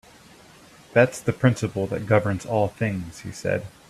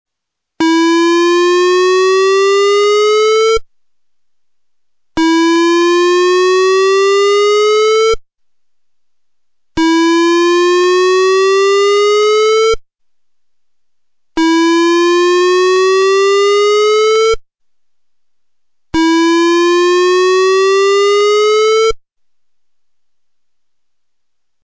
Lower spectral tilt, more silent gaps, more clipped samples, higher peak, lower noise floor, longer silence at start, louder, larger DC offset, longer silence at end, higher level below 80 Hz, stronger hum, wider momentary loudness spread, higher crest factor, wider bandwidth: first, -6.5 dB/octave vs -2.5 dB/octave; neither; neither; first, -2 dBFS vs -8 dBFS; second, -50 dBFS vs -78 dBFS; first, 0.95 s vs 0.6 s; second, -24 LUFS vs -10 LUFS; neither; second, 0.2 s vs 2.65 s; second, -54 dBFS vs -44 dBFS; neither; first, 8 LU vs 5 LU; first, 22 dB vs 4 dB; first, 14 kHz vs 8 kHz